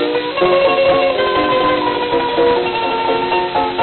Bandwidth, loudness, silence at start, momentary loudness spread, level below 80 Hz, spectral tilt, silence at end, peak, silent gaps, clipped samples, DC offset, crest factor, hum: 4.5 kHz; -15 LUFS; 0 s; 4 LU; -44 dBFS; -9.5 dB/octave; 0 s; -2 dBFS; none; under 0.1%; under 0.1%; 12 dB; none